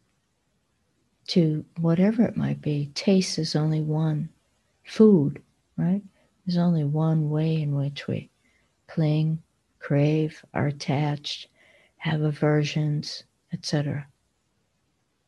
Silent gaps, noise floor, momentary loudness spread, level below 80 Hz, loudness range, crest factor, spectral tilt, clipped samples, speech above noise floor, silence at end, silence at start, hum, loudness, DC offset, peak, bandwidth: none; -72 dBFS; 12 LU; -62 dBFS; 4 LU; 20 dB; -7 dB/octave; under 0.1%; 49 dB; 1.25 s; 1.3 s; none; -25 LUFS; under 0.1%; -6 dBFS; 11 kHz